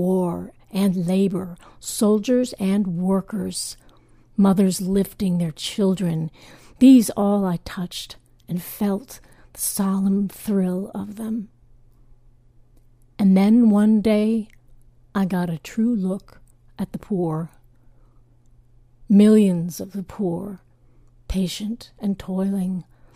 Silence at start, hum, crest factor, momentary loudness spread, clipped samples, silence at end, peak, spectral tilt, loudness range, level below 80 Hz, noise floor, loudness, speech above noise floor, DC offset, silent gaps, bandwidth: 0 s; none; 18 dB; 16 LU; under 0.1%; 0.35 s; -4 dBFS; -6.5 dB/octave; 7 LU; -48 dBFS; -53 dBFS; -21 LUFS; 33 dB; under 0.1%; none; 15.5 kHz